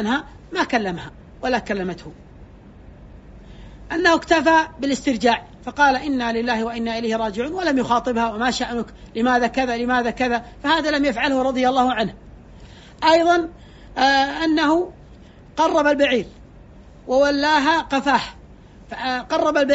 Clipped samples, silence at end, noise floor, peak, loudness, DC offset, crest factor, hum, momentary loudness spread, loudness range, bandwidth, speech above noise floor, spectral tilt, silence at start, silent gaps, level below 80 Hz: under 0.1%; 0 s; -44 dBFS; -4 dBFS; -20 LUFS; under 0.1%; 18 dB; none; 12 LU; 3 LU; 8 kHz; 25 dB; -2 dB/octave; 0 s; none; -46 dBFS